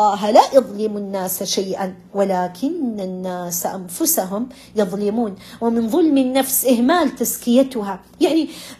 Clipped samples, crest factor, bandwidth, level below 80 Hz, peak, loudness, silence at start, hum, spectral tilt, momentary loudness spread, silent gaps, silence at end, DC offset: under 0.1%; 18 dB; 14 kHz; -58 dBFS; 0 dBFS; -19 LUFS; 0 s; none; -4 dB/octave; 10 LU; none; 0.05 s; under 0.1%